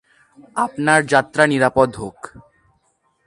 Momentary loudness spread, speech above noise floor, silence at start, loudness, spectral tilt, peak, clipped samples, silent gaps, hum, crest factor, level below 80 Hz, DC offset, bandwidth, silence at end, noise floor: 17 LU; 47 dB; 0.55 s; -17 LUFS; -5 dB/octave; 0 dBFS; under 0.1%; none; none; 20 dB; -52 dBFS; under 0.1%; 11.5 kHz; 1 s; -64 dBFS